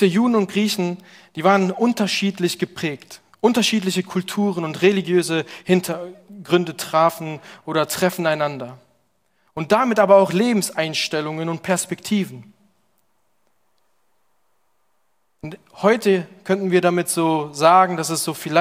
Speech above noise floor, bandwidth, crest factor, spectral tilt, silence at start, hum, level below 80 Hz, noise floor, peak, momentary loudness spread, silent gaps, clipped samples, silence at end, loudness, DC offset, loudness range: 51 dB; 16.5 kHz; 20 dB; -4.5 dB/octave; 0 s; none; -66 dBFS; -70 dBFS; -2 dBFS; 15 LU; none; under 0.1%; 0 s; -19 LUFS; under 0.1%; 7 LU